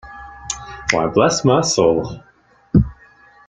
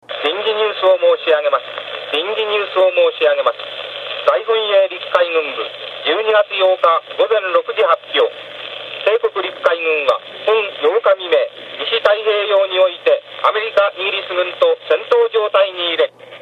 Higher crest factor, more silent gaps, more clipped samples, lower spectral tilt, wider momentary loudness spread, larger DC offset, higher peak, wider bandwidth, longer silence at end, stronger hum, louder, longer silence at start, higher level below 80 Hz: about the same, 18 dB vs 16 dB; neither; neither; first, -5 dB/octave vs -3 dB/octave; first, 18 LU vs 7 LU; neither; about the same, -2 dBFS vs 0 dBFS; first, 9.6 kHz vs 6.2 kHz; first, 0.55 s vs 0.05 s; neither; about the same, -17 LUFS vs -16 LUFS; about the same, 0.05 s vs 0.1 s; first, -36 dBFS vs -70 dBFS